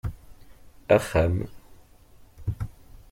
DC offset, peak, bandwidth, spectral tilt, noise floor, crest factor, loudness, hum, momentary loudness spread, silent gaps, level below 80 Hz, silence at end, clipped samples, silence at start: under 0.1%; -6 dBFS; 16.5 kHz; -7 dB/octave; -52 dBFS; 22 dB; -26 LUFS; none; 18 LU; none; -42 dBFS; 0.4 s; under 0.1%; 0.05 s